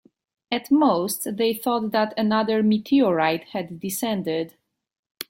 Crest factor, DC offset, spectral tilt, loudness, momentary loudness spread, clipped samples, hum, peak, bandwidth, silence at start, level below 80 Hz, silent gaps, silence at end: 16 dB; under 0.1%; -5 dB/octave; -23 LUFS; 10 LU; under 0.1%; none; -6 dBFS; 16.5 kHz; 0.5 s; -66 dBFS; 4.99-5.03 s; 0.05 s